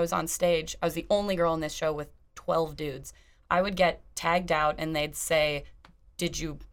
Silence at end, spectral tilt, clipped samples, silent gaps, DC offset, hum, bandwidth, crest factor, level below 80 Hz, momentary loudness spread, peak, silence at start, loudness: 0.05 s; -4 dB/octave; under 0.1%; none; under 0.1%; none; 20 kHz; 20 dB; -48 dBFS; 11 LU; -10 dBFS; 0 s; -28 LUFS